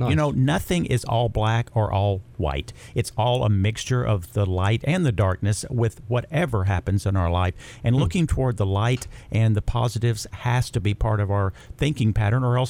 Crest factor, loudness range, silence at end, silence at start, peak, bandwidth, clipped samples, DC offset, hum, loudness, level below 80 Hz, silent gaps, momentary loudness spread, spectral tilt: 14 dB; 1 LU; 0 s; 0 s; -8 dBFS; 15.5 kHz; under 0.1%; under 0.1%; none; -23 LUFS; -38 dBFS; none; 6 LU; -6.5 dB/octave